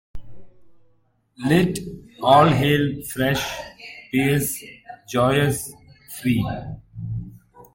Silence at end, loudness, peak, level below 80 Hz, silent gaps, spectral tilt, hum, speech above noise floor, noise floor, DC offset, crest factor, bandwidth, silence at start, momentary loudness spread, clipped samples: 0.1 s; -21 LUFS; -2 dBFS; -46 dBFS; none; -5.5 dB/octave; none; 42 dB; -62 dBFS; under 0.1%; 20 dB; 17 kHz; 0.15 s; 20 LU; under 0.1%